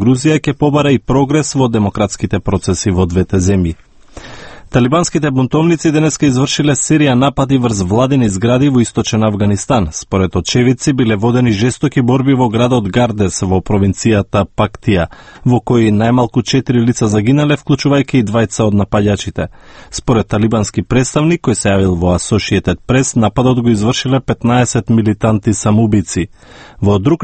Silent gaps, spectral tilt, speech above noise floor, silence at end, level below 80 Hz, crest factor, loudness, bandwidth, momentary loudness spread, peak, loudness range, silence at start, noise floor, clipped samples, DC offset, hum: none; -6 dB/octave; 21 dB; 0 s; -34 dBFS; 12 dB; -13 LUFS; 8.8 kHz; 4 LU; 0 dBFS; 2 LU; 0 s; -33 dBFS; under 0.1%; under 0.1%; none